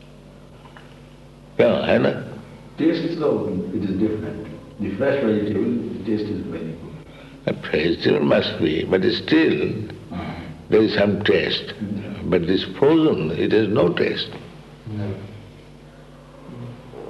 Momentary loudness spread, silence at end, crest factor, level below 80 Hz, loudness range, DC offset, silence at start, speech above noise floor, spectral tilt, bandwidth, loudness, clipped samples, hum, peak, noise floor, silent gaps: 19 LU; 0 s; 20 dB; -50 dBFS; 4 LU; under 0.1%; 0 s; 24 dB; -7.5 dB/octave; 8.8 kHz; -21 LUFS; under 0.1%; none; -2 dBFS; -44 dBFS; none